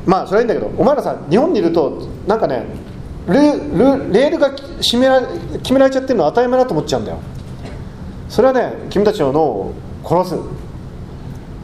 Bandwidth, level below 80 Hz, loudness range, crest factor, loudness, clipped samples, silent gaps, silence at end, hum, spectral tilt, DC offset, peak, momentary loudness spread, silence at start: 14.5 kHz; -36 dBFS; 4 LU; 16 dB; -15 LUFS; under 0.1%; none; 0 s; none; -6 dB/octave; under 0.1%; 0 dBFS; 18 LU; 0 s